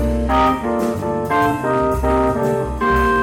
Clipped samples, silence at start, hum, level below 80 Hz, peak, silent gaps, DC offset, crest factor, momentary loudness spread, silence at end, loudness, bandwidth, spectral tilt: under 0.1%; 0 s; none; -28 dBFS; -8 dBFS; none; under 0.1%; 10 dB; 4 LU; 0 s; -18 LUFS; 17 kHz; -6.5 dB/octave